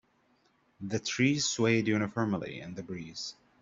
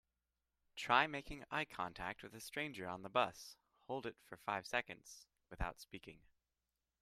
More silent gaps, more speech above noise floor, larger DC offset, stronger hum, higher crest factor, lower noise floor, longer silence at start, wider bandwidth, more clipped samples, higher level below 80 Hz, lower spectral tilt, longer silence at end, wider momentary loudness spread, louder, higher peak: neither; second, 39 dB vs over 47 dB; neither; neither; second, 18 dB vs 28 dB; second, -70 dBFS vs under -90 dBFS; about the same, 0.8 s vs 0.75 s; second, 7.8 kHz vs 15 kHz; neither; second, -68 dBFS vs -60 dBFS; about the same, -4.5 dB/octave vs -3.5 dB/octave; second, 0.3 s vs 0.85 s; second, 14 LU vs 21 LU; first, -31 LUFS vs -42 LUFS; about the same, -14 dBFS vs -16 dBFS